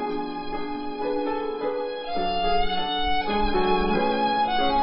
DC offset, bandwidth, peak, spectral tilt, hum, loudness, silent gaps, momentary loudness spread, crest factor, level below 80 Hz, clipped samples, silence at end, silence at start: under 0.1%; 5.6 kHz; -10 dBFS; -9.5 dB/octave; none; -25 LUFS; none; 8 LU; 14 dB; -38 dBFS; under 0.1%; 0 s; 0 s